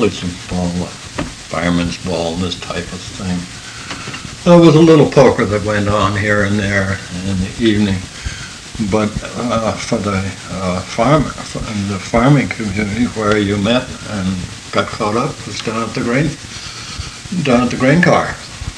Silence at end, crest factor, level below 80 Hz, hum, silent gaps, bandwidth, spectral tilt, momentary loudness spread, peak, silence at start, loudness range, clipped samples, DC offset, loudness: 0 s; 16 dB; -36 dBFS; none; none; 11 kHz; -5.5 dB/octave; 15 LU; 0 dBFS; 0 s; 8 LU; 0.2%; under 0.1%; -15 LUFS